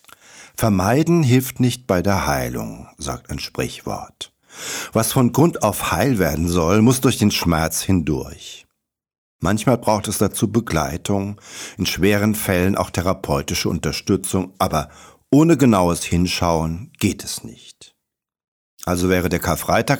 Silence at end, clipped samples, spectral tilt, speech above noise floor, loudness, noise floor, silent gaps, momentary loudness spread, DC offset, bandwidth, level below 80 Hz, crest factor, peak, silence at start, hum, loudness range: 0 s; under 0.1%; -5 dB/octave; 61 dB; -19 LUFS; -80 dBFS; 9.18-9.39 s, 18.48-18.77 s; 14 LU; under 0.1%; over 20 kHz; -40 dBFS; 16 dB; -4 dBFS; 0.35 s; none; 6 LU